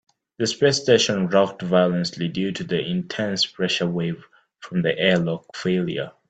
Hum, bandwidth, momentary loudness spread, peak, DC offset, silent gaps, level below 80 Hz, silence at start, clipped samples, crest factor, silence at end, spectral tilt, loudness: none; 8.8 kHz; 9 LU; -4 dBFS; under 0.1%; none; -62 dBFS; 0.4 s; under 0.1%; 20 dB; 0.2 s; -4.5 dB/octave; -22 LUFS